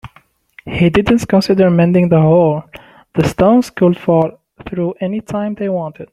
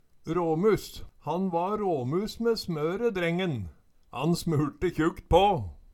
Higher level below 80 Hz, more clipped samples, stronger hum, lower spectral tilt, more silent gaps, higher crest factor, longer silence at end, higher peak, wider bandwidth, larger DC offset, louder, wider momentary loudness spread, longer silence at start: about the same, -42 dBFS vs -46 dBFS; neither; neither; about the same, -7.5 dB/octave vs -6.5 dB/octave; neither; second, 12 dB vs 20 dB; about the same, 0.1 s vs 0.15 s; first, -2 dBFS vs -8 dBFS; second, 13 kHz vs 18 kHz; neither; first, -14 LUFS vs -28 LUFS; about the same, 11 LU vs 10 LU; second, 0.05 s vs 0.25 s